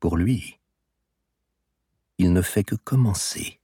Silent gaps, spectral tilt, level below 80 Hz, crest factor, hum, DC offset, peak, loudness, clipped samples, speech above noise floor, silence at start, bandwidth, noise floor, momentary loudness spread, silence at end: none; -5.5 dB/octave; -42 dBFS; 16 dB; none; under 0.1%; -8 dBFS; -23 LUFS; under 0.1%; 56 dB; 0 s; 18 kHz; -78 dBFS; 9 LU; 0.1 s